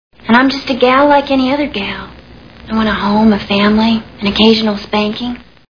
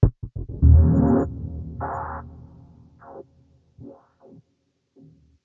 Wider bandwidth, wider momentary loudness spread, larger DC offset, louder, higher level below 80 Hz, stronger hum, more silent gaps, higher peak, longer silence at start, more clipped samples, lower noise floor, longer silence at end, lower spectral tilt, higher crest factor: first, 5.4 kHz vs 2 kHz; second, 12 LU vs 28 LU; first, 0.4% vs under 0.1%; first, -12 LUFS vs -21 LUFS; second, -38 dBFS vs -30 dBFS; neither; neither; about the same, 0 dBFS vs -2 dBFS; first, 0.25 s vs 0 s; first, 0.1% vs under 0.1%; second, -36 dBFS vs -71 dBFS; second, 0.3 s vs 1.55 s; second, -6.5 dB/octave vs -13 dB/octave; second, 12 dB vs 20 dB